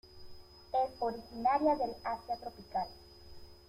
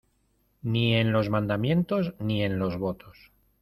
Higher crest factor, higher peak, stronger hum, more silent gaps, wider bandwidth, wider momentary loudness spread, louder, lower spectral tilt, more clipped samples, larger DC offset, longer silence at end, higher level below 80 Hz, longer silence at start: about the same, 18 dB vs 18 dB; second, -18 dBFS vs -10 dBFS; neither; neither; first, 16 kHz vs 13 kHz; first, 25 LU vs 9 LU; second, -35 LUFS vs -27 LUFS; second, -6 dB/octave vs -8.5 dB/octave; neither; neither; second, 0.15 s vs 0.5 s; about the same, -60 dBFS vs -56 dBFS; second, 0.05 s vs 0.65 s